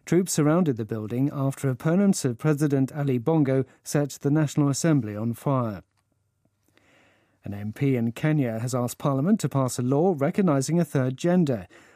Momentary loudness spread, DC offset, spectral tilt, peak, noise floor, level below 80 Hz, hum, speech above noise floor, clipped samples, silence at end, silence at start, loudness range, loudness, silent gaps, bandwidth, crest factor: 7 LU; under 0.1%; -6.5 dB/octave; -8 dBFS; -71 dBFS; -66 dBFS; none; 47 dB; under 0.1%; 0.3 s; 0.05 s; 6 LU; -24 LUFS; none; 15.5 kHz; 16 dB